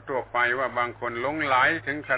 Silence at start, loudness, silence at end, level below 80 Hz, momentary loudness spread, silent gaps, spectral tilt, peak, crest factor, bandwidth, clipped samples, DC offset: 0 s; -25 LUFS; 0 s; -58 dBFS; 8 LU; none; -2 dB/octave; -10 dBFS; 16 dB; 4 kHz; under 0.1%; under 0.1%